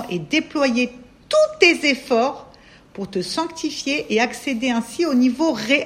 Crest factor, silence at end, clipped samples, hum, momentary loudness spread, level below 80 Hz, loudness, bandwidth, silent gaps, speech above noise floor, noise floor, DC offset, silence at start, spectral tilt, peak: 20 dB; 0 s; under 0.1%; none; 11 LU; -56 dBFS; -20 LUFS; 14.5 kHz; none; 27 dB; -46 dBFS; under 0.1%; 0 s; -3.5 dB/octave; -2 dBFS